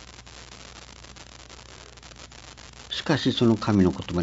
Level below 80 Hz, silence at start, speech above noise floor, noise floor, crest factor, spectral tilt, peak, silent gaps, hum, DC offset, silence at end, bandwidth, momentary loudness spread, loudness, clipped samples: -52 dBFS; 0 s; 24 dB; -46 dBFS; 20 dB; -6 dB/octave; -8 dBFS; none; none; under 0.1%; 0 s; 8 kHz; 23 LU; -23 LUFS; under 0.1%